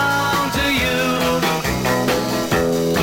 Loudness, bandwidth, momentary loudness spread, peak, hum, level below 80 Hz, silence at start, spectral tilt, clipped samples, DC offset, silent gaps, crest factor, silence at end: -18 LUFS; 17 kHz; 2 LU; -4 dBFS; none; -36 dBFS; 0 s; -4 dB/octave; under 0.1%; under 0.1%; none; 14 dB; 0 s